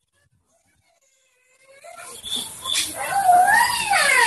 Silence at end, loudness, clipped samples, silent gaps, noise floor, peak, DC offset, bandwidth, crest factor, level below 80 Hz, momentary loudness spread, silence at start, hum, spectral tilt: 0 s; -18 LUFS; under 0.1%; none; -66 dBFS; -4 dBFS; under 0.1%; 13 kHz; 18 dB; -60 dBFS; 19 LU; 1.85 s; none; 0.5 dB/octave